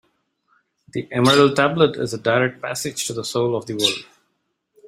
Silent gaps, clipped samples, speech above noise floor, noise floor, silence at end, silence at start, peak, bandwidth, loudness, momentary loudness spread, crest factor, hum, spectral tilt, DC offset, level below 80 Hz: none; under 0.1%; 53 dB; -72 dBFS; 0.85 s; 0.95 s; -2 dBFS; 16 kHz; -19 LUFS; 12 LU; 20 dB; none; -4 dB/octave; under 0.1%; -60 dBFS